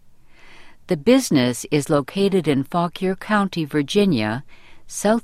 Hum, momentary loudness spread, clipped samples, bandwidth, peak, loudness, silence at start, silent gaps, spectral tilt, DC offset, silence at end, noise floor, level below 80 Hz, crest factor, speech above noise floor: none; 8 LU; under 0.1%; 15.5 kHz; -4 dBFS; -20 LUFS; 0.45 s; none; -5.5 dB/octave; under 0.1%; 0.05 s; -44 dBFS; -50 dBFS; 18 dB; 25 dB